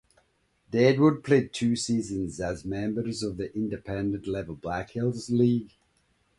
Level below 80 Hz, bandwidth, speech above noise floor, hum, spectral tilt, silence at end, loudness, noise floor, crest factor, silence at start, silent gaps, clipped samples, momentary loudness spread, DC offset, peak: -54 dBFS; 11.5 kHz; 42 dB; none; -6 dB/octave; 0.7 s; -27 LUFS; -69 dBFS; 20 dB; 0.7 s; none; under 0.1%; 11 LU; under 0.1%; -8 dBFS